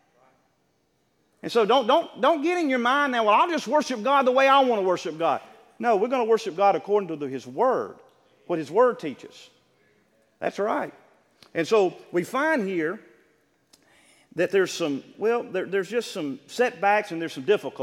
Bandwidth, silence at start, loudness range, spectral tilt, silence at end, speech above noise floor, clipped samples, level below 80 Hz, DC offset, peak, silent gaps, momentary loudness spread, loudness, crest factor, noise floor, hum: 15.5 kHz; 1.45 s; 7 LU; -4.5 dB/octave; 0 s; 46 dB; under 0.1%; -80 dBFS; under 0.1%; -8 dBFS; none; 12 LU; -24 LUFS; 18 dB; -69 dBFS; none